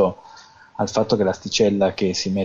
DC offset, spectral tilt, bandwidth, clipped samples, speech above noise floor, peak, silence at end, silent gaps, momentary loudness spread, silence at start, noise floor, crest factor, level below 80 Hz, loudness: under 0.1%; -5 dB/octave; 7.6 kHz; under 0.1%; 26 dB; -6 dBFS; 0 s; none; 11 LU; 0 s; -46 dBFS; 14 dB; -54 dBFS; -21 LUFS